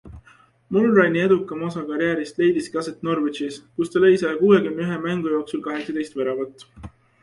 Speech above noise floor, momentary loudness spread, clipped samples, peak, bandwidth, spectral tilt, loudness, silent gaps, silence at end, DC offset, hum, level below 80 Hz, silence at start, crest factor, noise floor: 33 dB; 11 LU; under 0.1%; -2 dBFS; 11.5 kHz; -6.5 dB/octave; -21 LUFS; none; 0.35 s; under 0.1%; none; -54 dBFS; 0.05 s; 18 dB; -54 dBFS